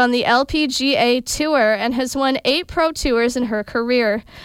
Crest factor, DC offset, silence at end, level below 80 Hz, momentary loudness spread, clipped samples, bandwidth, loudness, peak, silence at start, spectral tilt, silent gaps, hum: 14 dB; under 0.1%; 0 s; -40 dBFS; 5 LU; under 0.1%; 16.5 kHz; -18 LUFS; -4 dBFS; 0 s; -3 dB/octave; none; none